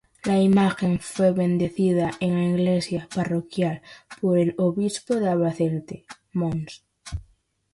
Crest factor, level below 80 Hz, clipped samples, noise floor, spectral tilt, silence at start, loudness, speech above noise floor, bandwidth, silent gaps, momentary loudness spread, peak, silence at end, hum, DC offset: 16 dB; -50 dBFS; under 0.1%; -61 dBFS; -7 dB/octave; 0.25 s; -23 LUFS; 38 dB; 11.5 kHz; none; 17 LU; -8 dBFS; 0.5 s; none; under 0.1%